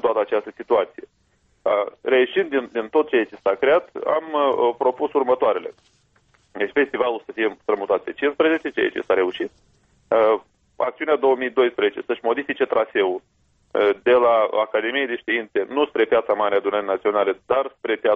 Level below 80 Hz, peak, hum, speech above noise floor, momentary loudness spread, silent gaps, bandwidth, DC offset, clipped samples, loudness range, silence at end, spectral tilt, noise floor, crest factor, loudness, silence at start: -64 dBFS; -6 dBFS; none; 43 dB; 7 LU; none; 4.7 kHz; under 0.1%; under 0.1%; 3 LU; 0 s; -6 dB/octave; -63 dBFS; 14 dB; -21 LUFS; 0.05 s